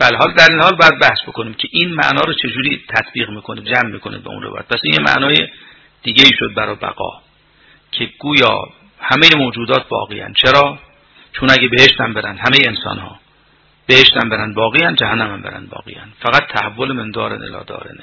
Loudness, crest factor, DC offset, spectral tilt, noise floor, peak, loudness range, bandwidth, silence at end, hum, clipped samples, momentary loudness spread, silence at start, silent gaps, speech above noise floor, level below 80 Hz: -12 LUFS; 14 dB; under 0.1%; -4 dB/octave; -52 dBFS; 0 dBFS; 5 LU; 6 kHz; 0.1 s; none; 0.8%; 20 LU; 0 s; none; 38 dB; -46 dBFS